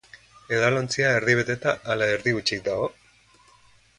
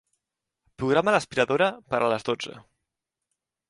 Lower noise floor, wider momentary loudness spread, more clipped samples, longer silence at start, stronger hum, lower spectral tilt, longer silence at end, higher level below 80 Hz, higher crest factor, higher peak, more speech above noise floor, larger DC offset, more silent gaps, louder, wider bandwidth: second, -57 dBFS vs -85 dBFS; second, 7 LU vs 10 LU; neither; second, 0.5 s vs 0.8 s; neither; about the same, -4.5 dB/octave vs -5 dB/octave; about the same, 1.1 s vs 1.1 s; about the same, -58 dBFS vs -62 dBFS; about the same, 20 dB vs 20 dB; about the same, -6 dBFS vs -8 dBFS; second, 33 dB vs 61 dB; neither; neither; about the same, -23 LUFS vs -25 LUFS; about the same, 11.5 kHz vs 11.5 kHz